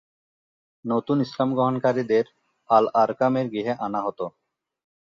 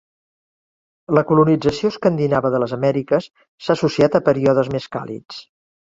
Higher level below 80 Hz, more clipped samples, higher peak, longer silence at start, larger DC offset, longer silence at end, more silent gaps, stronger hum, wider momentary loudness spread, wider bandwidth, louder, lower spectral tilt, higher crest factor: second, -70 dBFS vs -52 dBFS; neither; second, -4 dBFS vs 0 dBFS; second, 0.85 s vs 1.1 s; neither; first, 0.85 s vs 0.45 s; second, none vs 3.48-3.58 s; neither; second, 11 LU vs 14 LU; about the same, 7.2 kHz vs 7.8 kHz; second, -23 LUFS vs -18 LUFS; about the same, -8 dB/octave vs -7.5 dB/octave; about the same, 20 dB vs 18 dB